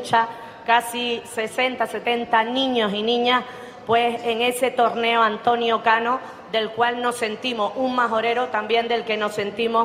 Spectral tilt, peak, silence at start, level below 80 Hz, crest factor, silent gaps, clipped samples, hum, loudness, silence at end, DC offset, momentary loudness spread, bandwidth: -3.5 dB/octave; -4 dBFS; 0 s; -64 dBFS; 18 dB; none; under 0.1%; none; -21 LUFS; 0 s; under 0.1%; 6 LU; 16 kHz